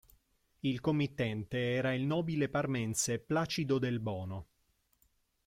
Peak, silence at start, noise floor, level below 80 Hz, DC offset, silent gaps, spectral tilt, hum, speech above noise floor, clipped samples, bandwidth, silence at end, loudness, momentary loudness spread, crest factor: -20 dBFS; 0.65 s; -75 dBFS; -64 dBFS; under 0.1%; none; -5 dB/octave; none; 42 dB; under 0.1%; 16 kHz; 1 s; -34 LUFS; 6 LU; 16 dB